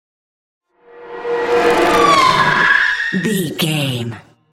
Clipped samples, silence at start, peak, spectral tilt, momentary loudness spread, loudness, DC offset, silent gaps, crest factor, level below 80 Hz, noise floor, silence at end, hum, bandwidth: under 0.1%; 0.95 s; -2 dBFS; -4 dB/octave; 13 LU; -14 LUFS; under 0.1%; none; 14 dB; -46 dBFS; -39 dBFS; 0.35 s; none; 16.5 kHz